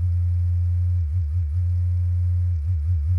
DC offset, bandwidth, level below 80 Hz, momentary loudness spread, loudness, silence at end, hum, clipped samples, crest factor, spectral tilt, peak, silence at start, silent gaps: under 0.1%; 1.3 kHz; -28 dBFS; 2 LU; -23 LUFS; 0 s; none; under 0.1%; 6 dB; -9.5 dB/octave; -14 dBFS; 0 s; none